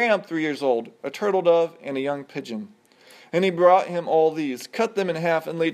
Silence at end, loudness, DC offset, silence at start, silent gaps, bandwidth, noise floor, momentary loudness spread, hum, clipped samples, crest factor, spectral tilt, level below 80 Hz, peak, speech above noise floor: 0 s; -23 LUFS; under 0.1%; 0 s; none; 13.5 kHz; -51 dBFS; 14 LU; none; under 0.1%; 18 dB; -5.5 dB/octave; -80 dBFS; -4 dBFS; 29 dB